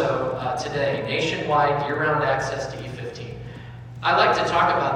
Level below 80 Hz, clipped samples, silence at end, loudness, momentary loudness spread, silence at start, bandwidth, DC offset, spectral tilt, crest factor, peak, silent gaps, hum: -50 dBFS; under 0.1%; 0 s; -22 LUFS; 17 LU; 0 s; 11.5 kHz; under 0.1%; -5 dB/octave; 18 dB; -6 dBFS; none; none